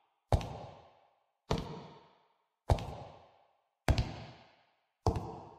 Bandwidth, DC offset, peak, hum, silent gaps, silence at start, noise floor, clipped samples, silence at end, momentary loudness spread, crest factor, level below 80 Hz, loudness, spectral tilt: 14.5 kHz; under 0.1%; -10 dBFS; none; none; 0.3 s; -75 dBFS; under 0.1%; 0 s; 19 LU; 28 dB; -44 dBFS; -37 LUFS; -6.5 dB/octave